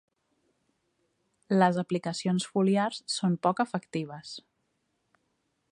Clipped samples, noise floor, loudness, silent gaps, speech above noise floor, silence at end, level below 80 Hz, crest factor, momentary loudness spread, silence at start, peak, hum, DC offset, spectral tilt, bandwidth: under 0.1%; -77 dBFS; -28 LUFS; none; 49 dB; 1.3 s; -78 dBFS; 22 dB; 14 LU; 1.5 s; -8 dBFS; none; under 0.1%; -5.5 dB/octave; 10.5 kHz